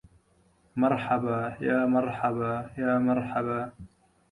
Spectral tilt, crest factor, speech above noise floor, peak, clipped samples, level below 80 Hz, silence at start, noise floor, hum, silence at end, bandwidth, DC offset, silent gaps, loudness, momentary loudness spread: -8.5 dB/octave; 16 dB; 38 dB; -12 dBFS; under 0.1%; -60 dBFS; 0.75 s; -65 dBFS; none; 0.45 s; 10 kHz; under 0.1%; none; -28 LUFS; 7 LU